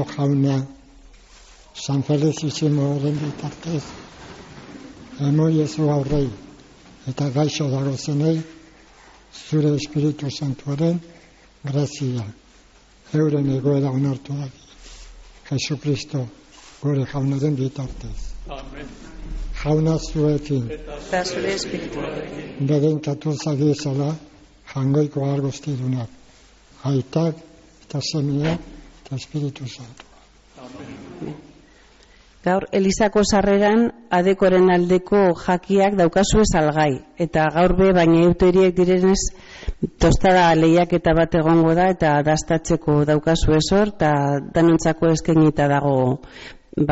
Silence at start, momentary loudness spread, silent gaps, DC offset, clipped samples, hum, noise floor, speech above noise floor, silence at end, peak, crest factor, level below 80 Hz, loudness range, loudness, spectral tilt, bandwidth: 0 s; 19 LU; none; under 0.1%; under 0.1%; none; -51 dBFS; 32 dB; 0 s; -6 dBFS; 14 dB; -36 dBFS; 9 LU; -20 LUFS; -6.5 dB/octave; 8 kHz